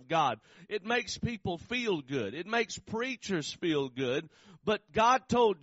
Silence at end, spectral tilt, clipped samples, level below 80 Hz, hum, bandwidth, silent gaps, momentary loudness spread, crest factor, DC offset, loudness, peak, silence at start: 0.05 s; -3 dB/octave; under 0.1%; -60 dBFS; none; 8 kHz; none; 10 LU; 18 dB; under 0.1%; -32 LUFS; -14 dBFS; 0 s